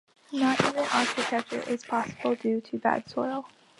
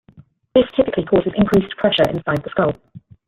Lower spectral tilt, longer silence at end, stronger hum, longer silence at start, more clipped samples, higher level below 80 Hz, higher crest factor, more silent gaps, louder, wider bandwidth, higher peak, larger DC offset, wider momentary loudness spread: second, -4 dB/octave vs -7 dB/octave; about the same, 0.35 s vs 0.3 s; neither; second, 0.3 s vs 0.55 s; neither; second, -68 dBFS vs -46 dBFS; about the same, 20 dB vs 16 dB; neither; second, -28 LUFS vs -18 LUFS; second, 11.5 kHz vs 15.5 kHz; second, -8 dBFS vs -2 dBFS; neither; first, 8 LU vs 5 LU